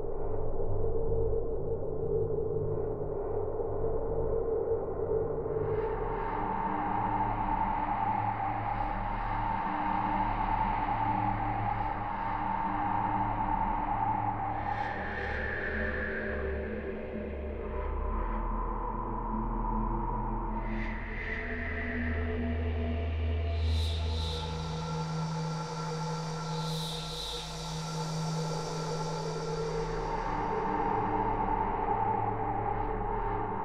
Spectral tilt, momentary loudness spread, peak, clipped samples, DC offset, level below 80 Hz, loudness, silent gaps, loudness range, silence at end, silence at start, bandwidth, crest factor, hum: -6 dB/octave; 5 LU; -18 dBFS; under 0.1%; under 0.1%; -38 dBFS; -33 LUFS; none; 4 LU; 0 s; 0 s; 13 kHz; 14 dB; none